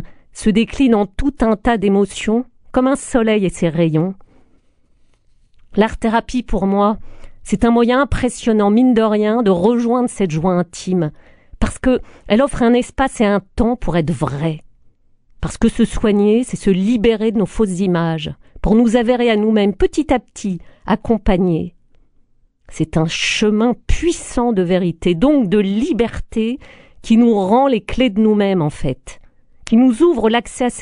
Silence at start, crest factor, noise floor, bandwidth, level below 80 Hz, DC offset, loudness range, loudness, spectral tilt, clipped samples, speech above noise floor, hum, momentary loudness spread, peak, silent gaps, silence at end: 0 s; 16 dB; -54 dBFS; 11 kHz; -30 dBFS; under 0.1%; 4 LU; -16 LUFS; -6 dB/octave; under 0.1%; 39 dB; none; 10 LU; 0 dBFS; none; 0 s